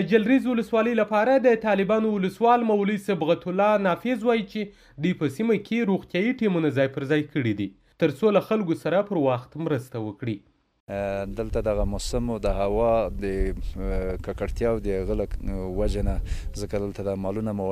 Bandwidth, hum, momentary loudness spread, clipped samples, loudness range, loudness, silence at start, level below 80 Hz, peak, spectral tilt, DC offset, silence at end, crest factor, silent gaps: 15 kHz; none; 11 LU; under 0.1%; 7 LU; -25 LUFS; 0 s; -36 dBFS; -8 dBFS; -7 dB/octave; under 0.1%; 0 s; 16 dB; 10.80-10.87 s